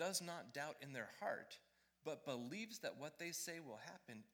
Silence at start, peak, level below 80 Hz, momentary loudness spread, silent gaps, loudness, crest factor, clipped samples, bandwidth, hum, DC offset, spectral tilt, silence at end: 0 s; -28 dBFS; under -90 dBFS; 10 LU; none; -49 LUFS; 22 dB; under 0.1%; over 20 kHz; none; under 0.1%; -3 dB/octave; 0.05 s